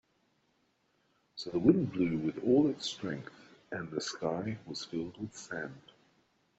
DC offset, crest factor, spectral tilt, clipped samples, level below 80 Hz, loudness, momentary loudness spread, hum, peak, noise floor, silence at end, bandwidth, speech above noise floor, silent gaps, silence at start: under 0.1%; 24 dB; -6 dB/octave; under 0.1%; -68 dBFS; -33 LUFS; 16 LU; none; -10 dBFS; -74 dBFS; 0.8 s; 8.2 kHz; 42 dB; none; 1.35 s